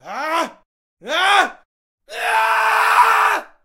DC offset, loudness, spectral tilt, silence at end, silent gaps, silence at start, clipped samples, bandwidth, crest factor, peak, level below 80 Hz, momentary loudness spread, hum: under 0.1%; -16 LUFS; 0 dB/octave; 0.2 s; 0.65-0.97 s, 1.65-1.98 s; 0.05 s; under 0.1%; 16 kHz; 18 dB; 0 dBFS; -64 dBFS; 11 LU; none